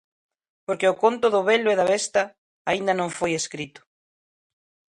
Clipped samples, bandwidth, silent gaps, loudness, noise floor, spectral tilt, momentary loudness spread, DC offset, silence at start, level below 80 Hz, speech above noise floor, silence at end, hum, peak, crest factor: under 0.1%; 11.5 kHz; 2.38-2.65 s; -23 LUFS; under -90 dBFS; -3.5 dB/octave; 13 LU; under 0.1%; 0.7 s; -66 dBFS; over 68 dB; 1.3 s; none; -6 dBFS; 18 dB